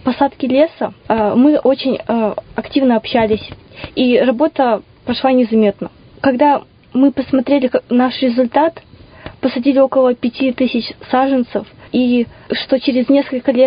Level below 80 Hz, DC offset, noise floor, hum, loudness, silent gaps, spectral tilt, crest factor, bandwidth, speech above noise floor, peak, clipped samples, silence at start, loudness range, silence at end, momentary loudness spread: -48 dBFS; under 0.1%; -36 dBFS; none; -15 LUFS; none; -10.5 dB/octave; 14 dB; 5.2 kHz; 22 dB; 0 dBFS; under 0.1%; 0.05 s; 1 LU; 0 s; 9 LU